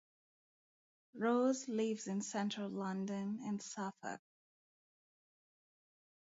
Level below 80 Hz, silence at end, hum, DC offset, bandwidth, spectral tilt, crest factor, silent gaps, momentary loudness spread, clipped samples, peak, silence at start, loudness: -88 dBFS; 2.15 s; none; under 0.1%; 7.6 kHz; -5.5 dB/octave; 18 dB; none; 13 LU; under 0.1%; -24 dBFS; 1.15 s; -40 LUFS